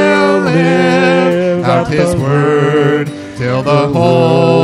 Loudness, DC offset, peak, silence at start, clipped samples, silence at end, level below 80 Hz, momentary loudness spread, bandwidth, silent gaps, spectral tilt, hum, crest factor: -11 LUFS; under 0.1%; 0 dBFS; 0 s; under 0.1%; 0 s; -42 dBFS; 6 LU; 12 kHz; none; -7 dB/octave; none; 10 dB